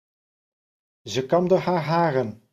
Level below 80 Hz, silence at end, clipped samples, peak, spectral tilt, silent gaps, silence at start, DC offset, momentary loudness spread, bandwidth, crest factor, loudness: -64 dBFS; 0.2 s; under 0.1%; -8 dBFS; -6.5 dB/octave; none; 1.05 s; under 0.1%; 8 LU; 14 kHz; 18 dB; -23 LUFS